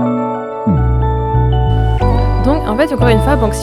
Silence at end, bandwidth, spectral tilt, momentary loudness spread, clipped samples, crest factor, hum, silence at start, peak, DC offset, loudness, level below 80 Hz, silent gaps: 0 s; 13 kHz; -7.5 dB/octave; 4 LU; under 0.1%; 12 dB; none; 0 s; 0 dBFS; under 0.1%; -14 LUFS; -18 dBFS; none